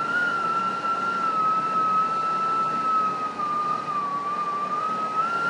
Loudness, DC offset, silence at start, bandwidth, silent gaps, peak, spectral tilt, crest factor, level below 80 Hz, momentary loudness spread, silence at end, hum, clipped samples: -24 LUFS; under 0.1%; 0 s; 11 kHz; none; -14 dBFS; -4.5 dB/octave; 10 dB; -72 dBFS; 5 LU; 0 s; none; under 0.1%